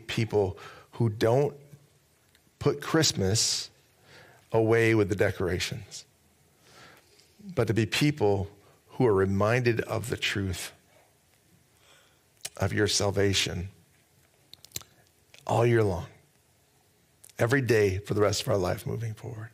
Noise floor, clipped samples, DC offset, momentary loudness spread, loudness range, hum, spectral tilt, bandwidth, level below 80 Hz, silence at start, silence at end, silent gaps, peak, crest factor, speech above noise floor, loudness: -65 dBFS; under 0.1%; under 0.1%; 17 LU; 5 LU; none; -4.5 dB/octave; 16 kHz; -60 dBFS; 0 s; 0.05 s; none; -10 dBFS; 18 dB; 39 dB; -27 LUFS